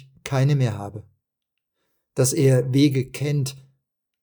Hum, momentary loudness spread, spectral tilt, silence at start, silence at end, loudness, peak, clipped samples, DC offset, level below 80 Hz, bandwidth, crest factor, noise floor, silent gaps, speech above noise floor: none; 15 LU; -6 dB/octave; 0.25 s; 0.65 s; -21 LUFS; -6 dBFS; under 0.1%; under 0.1%; -62 dBFS; over 20 kHz; 16 dB; -82 dBFS; none; 61 dB